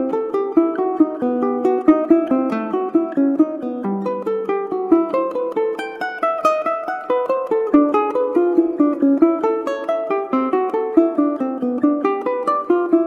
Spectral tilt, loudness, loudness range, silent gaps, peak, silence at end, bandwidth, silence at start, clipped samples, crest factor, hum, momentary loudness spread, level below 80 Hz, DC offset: -7.5 dB/octave; -19 LUFS; 3 LU; none; -2 dBFS; 0 s; 7.2 kHz; 0 s; under 0.1%; 16 dB; none; 7 LU; -62 dBFS; under 0.1%